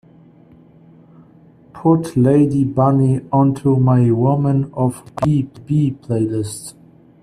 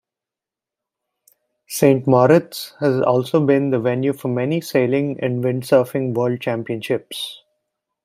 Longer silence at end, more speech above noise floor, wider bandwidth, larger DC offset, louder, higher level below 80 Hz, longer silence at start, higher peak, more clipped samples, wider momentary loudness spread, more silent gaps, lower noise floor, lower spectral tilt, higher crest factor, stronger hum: second, 0.5 s vs 0.7 s; second, 31 dB vs 70 dB; second, 12.5 kHz vs 16 kHz; neither; about the same, -17 LUFS vs -19 LUFS; first, -50 dBFS vs -64 dBFS; about the same, 1.75 s vs 1.7 s; about the same, -2 dBFS vs -2 dBFS; neither; second, 7 LU vs 10 LU; neither; second, -47 dBFS vs -88 dBFS; first, -9 dB/octave vs -6.5 dB/octave; about the same, 16 dB vs 18 dB; neither